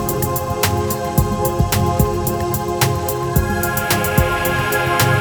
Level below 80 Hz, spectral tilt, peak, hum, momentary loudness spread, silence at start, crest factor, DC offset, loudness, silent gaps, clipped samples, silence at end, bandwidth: -28 dBFS; -5 dB/octave; 0 dBFS; none; 4 LU; 0 s; 18 dB; under 0.1%; -18 LUFS; none; under 0.1%; 0 s; over 20 kHz